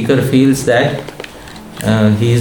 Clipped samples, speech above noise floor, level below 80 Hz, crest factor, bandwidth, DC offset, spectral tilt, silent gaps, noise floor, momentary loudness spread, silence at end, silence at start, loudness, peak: under 0.1%; 21 dB; -42 dBFS; 12 dB; 19 kHz; 0.4%; -6.5 dB/octave; none; -32 dBFS; 19 LU; 0 s; 0 s; -13 LUFS; 0 dBFS